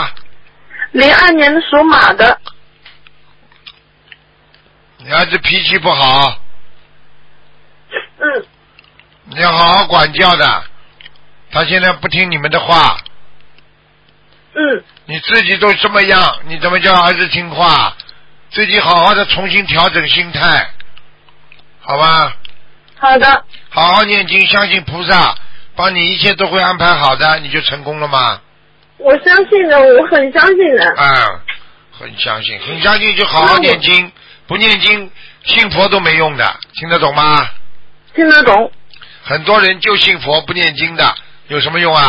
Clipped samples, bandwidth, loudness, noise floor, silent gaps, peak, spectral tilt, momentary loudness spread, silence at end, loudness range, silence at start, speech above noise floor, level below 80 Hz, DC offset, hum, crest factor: 0.1%; 8 kHz; -9 LUFS; -50 dBFS; none; 0 dBFS; -5.5 dB/octave; 13 LU; 0 s; 5 LU; 0 s; 40 dB; -42 dBFS; under 0.1%; 50 Hz at -50 dBFS; 12 dB